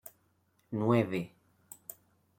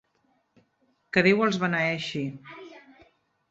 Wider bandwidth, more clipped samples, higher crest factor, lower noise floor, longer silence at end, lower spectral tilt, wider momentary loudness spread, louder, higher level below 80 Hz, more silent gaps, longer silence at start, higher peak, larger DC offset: first, 16.5 kHz vs 8 kHz; neither; about the same, 22 dB vs 24 dB; about the same, -72 dBFS vs -70 dBFS; first, 1.1 s vs 0.7 s; about the same, -7 dB/octave vs -6 dB/octave; about the same, 23 LU vs 23 LU; second, -31 LUFS vs -25 LUFS; second, -74 dBFS vs -68 dBFS; neither; second, 0.7 s vs 1.15 s; second, -14 dBFS vs -6 dBFS; neither